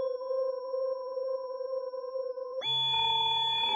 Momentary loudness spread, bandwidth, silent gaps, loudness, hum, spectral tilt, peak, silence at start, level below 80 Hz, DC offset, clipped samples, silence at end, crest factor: 11 LU; 11 kHz; none; -30 LUFS; none; -2.5 dB/octave; -18 dBFS; 0 s; -72 dBFS; under 0.1%; under 0.1%; 0 s; 12 dB